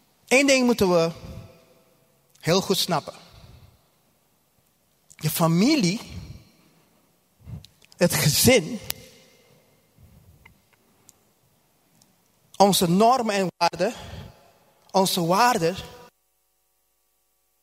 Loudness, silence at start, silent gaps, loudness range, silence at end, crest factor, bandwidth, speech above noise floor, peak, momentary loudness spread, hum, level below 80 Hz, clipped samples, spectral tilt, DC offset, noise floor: -21 LUFS; 0.3 s; none; 6 LU; 1.65 s; 26 dB; 16 kHz; 50 dB; 0 dBFS; 24 LU; none; -54 dBFS; under 0.1%; -4 dB/octave; under 0.1%; -70 dBFS